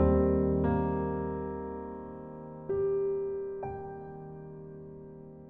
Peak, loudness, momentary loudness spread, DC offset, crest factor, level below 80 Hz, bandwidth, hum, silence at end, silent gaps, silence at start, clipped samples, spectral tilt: -14 dBFS; -32 LUFS; 18 LU; under 0.1%; 18 dB; -42 dBFS; 3.7 kHz; none; 0 s; none; 0 s; under 0.1%; -12.5 dB/octave